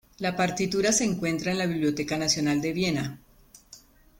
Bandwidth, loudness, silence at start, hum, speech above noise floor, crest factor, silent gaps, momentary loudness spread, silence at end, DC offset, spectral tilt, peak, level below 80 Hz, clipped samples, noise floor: 17 kHz; -26 LUFS; 0.2 s; none; 27 dB; 16 dB; none; 5 LU; 0.45 s; under 0.1%; -4 dB/octave; -10 dBFS; -56 dBFS; under 0.1%; -53 dBFS